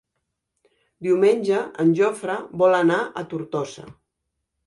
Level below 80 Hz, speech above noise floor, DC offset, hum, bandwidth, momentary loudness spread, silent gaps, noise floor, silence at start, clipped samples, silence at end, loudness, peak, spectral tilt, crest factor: -68 dBFS; 58 dB; under 0.1%; none; 11.5 kHz; 13 LU; none; -79 dBFS; 1 s; under 0.1%; 0.75 s; -21 LUFS; -6 dBFS; -6.5 dB/octave; 16 dB